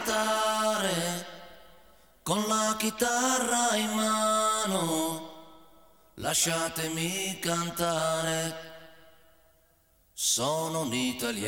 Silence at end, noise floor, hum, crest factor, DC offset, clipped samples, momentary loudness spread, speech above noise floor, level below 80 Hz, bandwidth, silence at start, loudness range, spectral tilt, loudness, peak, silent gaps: 0 s; -66 dBFS; none; 16 dB; 0.1%; under 0.1%; 11 LU; 37 dB; -64 dBFS; 18 kHz; 0 s; 5 LU; -2.5 dB/octave; -28 LUFS; -14 dBFS; none